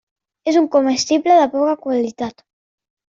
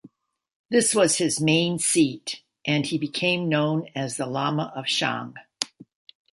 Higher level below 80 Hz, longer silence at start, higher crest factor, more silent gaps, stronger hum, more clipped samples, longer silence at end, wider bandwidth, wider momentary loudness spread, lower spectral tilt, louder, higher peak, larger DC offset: first, -62 dBFS vs -68 dBFS; first, 0.45 s vs 0.05 s; second, 16 dB vs 22 dB; second, none vs 0.55-0.69 s; neither; neither; first, 0.8 s vs 0.5 s; second, 7.8 kHz vs 12 kHz; about the same, 12 LU vs 11 LU; about the same, -3.5 dB/octave vs -3.5 dB/octave; first, -16 LUFS vs -24 LUFS; about the same, -2 dBFS vs -2 dBFS; neither